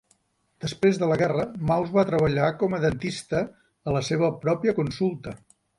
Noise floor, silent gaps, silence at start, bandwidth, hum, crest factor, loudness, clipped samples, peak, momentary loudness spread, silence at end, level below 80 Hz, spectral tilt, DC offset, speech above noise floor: -67 dBFS; none; 0.6 s; 11.5 kHz; none; 18 dB; -25 LUFS; under 0.1%; -8 dBFS; 13 LU; 0.4 s; -52 dBFS; -6.5 dB/octave; under 0.1%; 43 dB